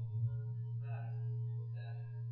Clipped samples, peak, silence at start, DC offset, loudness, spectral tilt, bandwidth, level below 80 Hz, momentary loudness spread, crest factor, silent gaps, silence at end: under 0.1%; -28 dBFS; 0 s; under 0.1%; -42 LUFS; -9.5 dB/octave; 4.1 kHz; -70 dBFS; 5 LU; 12 dB; none; 0 s